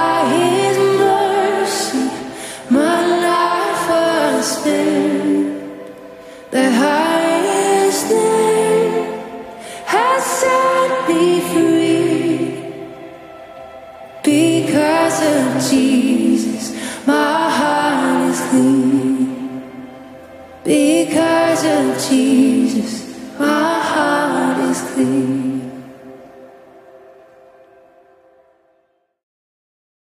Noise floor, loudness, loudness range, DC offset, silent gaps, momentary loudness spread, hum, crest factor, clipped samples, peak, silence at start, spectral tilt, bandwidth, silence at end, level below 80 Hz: -62 dBFS; -15 LUFS; 3 LU; under 0.1%; none; 17 LU; none; 14 dB; under 0.1%; -2 dBFS; 0 s; -4 dB/octave; 15.5 kHz; 3.55 s; -60 dBFS